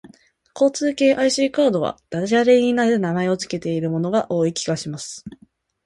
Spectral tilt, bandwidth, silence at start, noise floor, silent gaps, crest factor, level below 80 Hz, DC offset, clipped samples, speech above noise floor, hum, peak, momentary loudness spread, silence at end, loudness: -5 dB/octave; 11.5 kHz; 0.05 s; -52 dBFS; none; 16 dB; -60 dBFS; under 0.1%; under 0.1%; 33 dB; none; -4 dBFS; 11 LU; 0.55 s; -20 LUFS